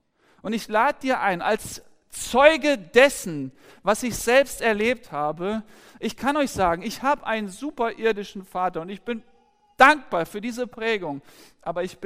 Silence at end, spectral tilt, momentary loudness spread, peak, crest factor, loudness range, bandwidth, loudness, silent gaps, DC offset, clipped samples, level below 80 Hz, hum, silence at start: 0 s; -3.5 dB/octave; 16 LU; -2 dBFS; 22 dB; 5 LU; 16 kHz; -23 LUFS; none; under 0.1%; under 0.1%; -52 dBFS; none; 0.45 s